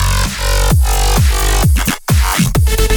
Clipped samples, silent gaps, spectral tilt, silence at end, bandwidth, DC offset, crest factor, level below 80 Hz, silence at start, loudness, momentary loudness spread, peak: under 0.1%; none; -4 dB/octave; 0 s; over 20 kHz; under 0.1%; 10 dB; -14 dBFS; 0 s; -13 LUFS; 3 LU; 0 dBFS